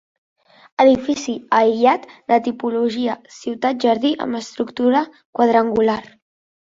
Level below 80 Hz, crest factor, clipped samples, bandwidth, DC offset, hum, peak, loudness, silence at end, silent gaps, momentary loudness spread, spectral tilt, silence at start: -58 dBFS; 16 dB; under 0.1%; 7.8 kHz; under 0.1%; none; -2 dBFS; -18 LUFS; 0.6 s; 5.25-5.33 s; 11 LU; -5 dB/octave; 0.8 s